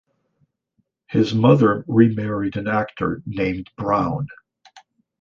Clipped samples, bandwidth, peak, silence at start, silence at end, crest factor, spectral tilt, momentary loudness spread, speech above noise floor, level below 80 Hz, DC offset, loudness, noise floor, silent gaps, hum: under 0.1%; 7.2 kHz; -2 dBFS; 1.1 s; 0.4 s; 18 dB; -8.5 dB/octave; 10 LU; 51 dB; -50 dBFS; under 0.1%; -20 LUFS; -70 dBFS; none; none